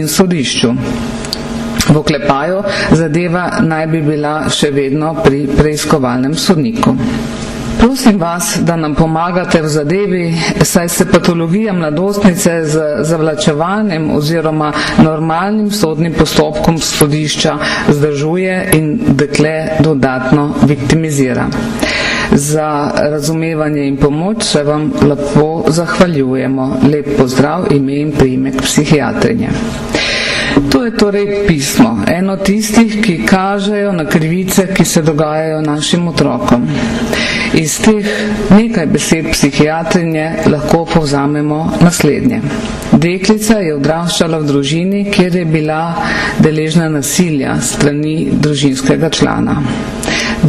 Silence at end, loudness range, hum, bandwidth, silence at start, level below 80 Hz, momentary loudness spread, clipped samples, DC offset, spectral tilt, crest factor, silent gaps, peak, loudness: 0 s; 1 LU; none; 14.5 kHz; 0 s; -32 dBFS; 4 LU; under 0.1%; under 0.1%; -5 dB/octave; 12 dB; none; 0 dBFS; -12 LUFS